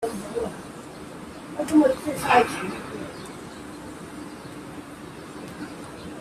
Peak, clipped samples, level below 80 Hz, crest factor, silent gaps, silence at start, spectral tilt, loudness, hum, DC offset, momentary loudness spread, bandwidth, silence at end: -4 dBFS; under 0.1%; -56 dBFS; 24 dB; none; 0 s; -5 dB/octave; -25 LUFS; none; under 0.1%; 20 LU; 14.5 kHz; 0 s